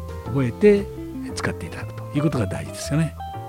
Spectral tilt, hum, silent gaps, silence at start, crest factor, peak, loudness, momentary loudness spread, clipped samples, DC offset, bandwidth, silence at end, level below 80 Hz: -6.5 dB/octave; none; none; 0 s; 18 dB; -4 dBFS; -23 LUFS; 15 LU; under 0.1%; under 0.1%; 16 kHz; 0 s; -44 dBFS